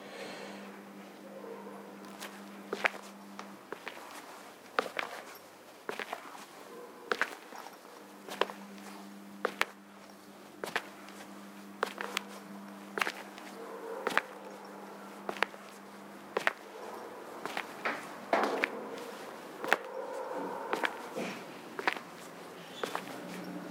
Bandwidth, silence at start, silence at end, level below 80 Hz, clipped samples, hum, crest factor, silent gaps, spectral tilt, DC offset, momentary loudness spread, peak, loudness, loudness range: 17.5 kHz; 0 s; 0 s; -90 dBFS; under 0.1%; none; 34 dB; none; -3 dB/octave; under 0.1%; 16 LU; -4 dBFS; -38 LUFS; 6 LU